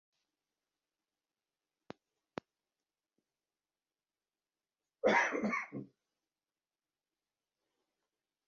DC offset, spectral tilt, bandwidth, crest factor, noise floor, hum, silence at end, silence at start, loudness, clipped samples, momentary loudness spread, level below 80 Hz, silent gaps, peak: under 0.1%; -3 dB/octave; 7 kHz; 26 dB; under -90 dBFS; none; 2.6 s; 5.05 s; -33 LUFS; under 0.1%; 20 LU; -84 dBFS; none; -18 dBFS